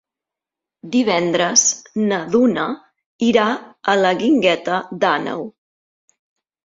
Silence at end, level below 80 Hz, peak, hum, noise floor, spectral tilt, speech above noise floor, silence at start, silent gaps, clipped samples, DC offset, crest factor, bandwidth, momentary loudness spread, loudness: 1.15 s; -62 dBFS; 0 dBFS; none; -86 dBFS; -3 dB/octave; 69 dB; 0.85 s; 3.06-3.19 s; under 0.1%; under 0.1%; 18 dB; 7.8 kHz; 10 LU; -17 LUFS